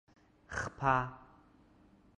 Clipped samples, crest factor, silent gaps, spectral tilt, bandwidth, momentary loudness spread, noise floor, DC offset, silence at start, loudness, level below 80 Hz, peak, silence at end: under 0.1%; 24 dB; none; -5.5 dB/octave; 11 kHz; 14 LU; -64 dBFS; under 0.1%; 0.5 s; -35 LUFS; -58 dBFS; -16 dBFS; 1 s